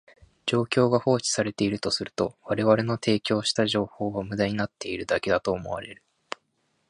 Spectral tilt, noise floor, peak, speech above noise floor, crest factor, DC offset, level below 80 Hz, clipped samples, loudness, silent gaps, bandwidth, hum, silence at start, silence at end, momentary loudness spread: -4.5 dB/octave; -72 dBFS; -6 dBFS; 47 dB; 22 dB; under 0.1%; -56 dBFS; under 0.1%; -26 LUFS; none; 11 kHz; none; 0.45 s; 0.95 s; 12 LU